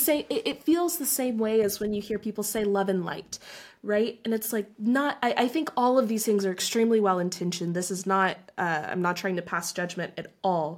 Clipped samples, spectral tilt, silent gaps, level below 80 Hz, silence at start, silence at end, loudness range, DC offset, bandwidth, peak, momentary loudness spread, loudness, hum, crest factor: under 0.1%; -4 dB/octave; none; -66 dBFS; 0 s; 0 s; 3 LU; under 0.1%; 17 kHz; -10 dBFS; 8 LU; -27 LUFS; none; 16 dB